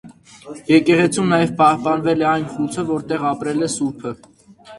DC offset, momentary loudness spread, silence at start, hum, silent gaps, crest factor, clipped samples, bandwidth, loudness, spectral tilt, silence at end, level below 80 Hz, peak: under 0.1%; 16 LU; 0.05 s; none; none; 18 dB; under 0.1%; 11.5 kHz; -18 LUFS; -5.5 dB/octave; 0 s; -56 dBFS; -2 dBFS